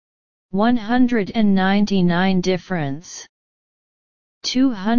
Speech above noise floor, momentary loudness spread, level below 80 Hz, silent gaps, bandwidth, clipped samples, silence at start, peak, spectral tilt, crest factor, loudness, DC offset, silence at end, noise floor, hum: over 72 dB; 11 LU; -46 dBFS; 3.29-4.41 s; 7.2 kHz; under 0.1%; 0.5 s; -4 dBFS; -6 dB/octave; 16 dB; -19 LUFS; 4%; 0 s; under -90 dBFS; none